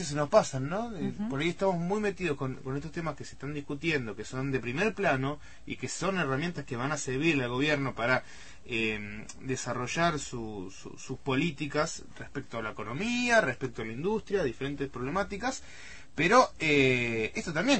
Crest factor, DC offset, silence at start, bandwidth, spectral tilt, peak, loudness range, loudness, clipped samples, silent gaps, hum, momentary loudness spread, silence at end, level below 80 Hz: 22 dB; 0.5%; 0 s; 8.8 kHz; -5 dB/octave; -8 dBFS; 5 LU; -30 LUFS; under 0.1%; none; none; 16 LU; 0 s; -54 dBFS